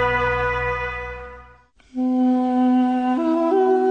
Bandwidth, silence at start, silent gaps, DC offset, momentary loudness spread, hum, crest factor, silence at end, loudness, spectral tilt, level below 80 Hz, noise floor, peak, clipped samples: 6.4 kHz; 0 s; none; under 0.1%; 15 LU; none; 12 dB; 0 s; -20 LUFS; -7.5 dB/octave; -40 dBFS; -50 dBFS; -8 dBFS; under 0.1%